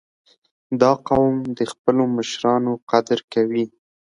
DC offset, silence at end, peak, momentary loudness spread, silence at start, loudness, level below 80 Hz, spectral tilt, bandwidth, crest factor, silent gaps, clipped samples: under 0.1%; 0.45 s; -2 dBFS; 7 LU; 0.7 s; -20 LUFS; -54 dBFS; -6 dB/octave; 11 kHz; 20 dB; 1.79-1.85 s, 2.82-2.87 s, 3.24-3.28 s; under 0.1%